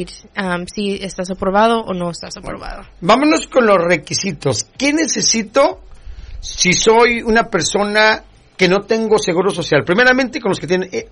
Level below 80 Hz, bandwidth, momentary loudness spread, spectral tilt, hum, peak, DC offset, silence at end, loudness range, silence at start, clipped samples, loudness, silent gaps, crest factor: -40 dBFS; 11 kHz; 12 LU; -3.5 dB/octave; none; 0 dBFS; under 0.1%; 0.05 s; 2 LU; 0 s; under 0.1%; -15 LUFS; none; 16 dB